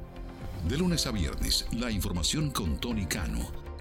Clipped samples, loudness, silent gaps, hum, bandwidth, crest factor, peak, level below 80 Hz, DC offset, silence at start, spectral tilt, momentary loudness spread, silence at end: under 0.1%; -30 LUFS; none; none; 18.5 kHz; 16 dB; -14 dBFS; -36 dBFS; under 0.1%; 0 s; -4 dB/octave; 11 LU; 0 s